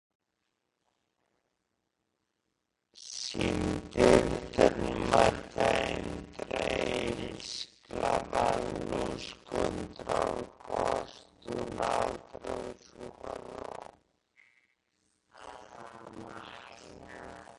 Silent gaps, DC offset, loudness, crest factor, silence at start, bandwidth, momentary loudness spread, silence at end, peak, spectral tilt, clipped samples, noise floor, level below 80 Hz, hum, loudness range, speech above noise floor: none; under 0.1%; -31 LUFS; 26 dB; 2.95 s; 11.5 kHz; 22 LU; 0 s; -8 dBFS; -5 dB/octave; under 0.1%; -82 dBFS; -52 dBFS; none; 20 LU; 56 dB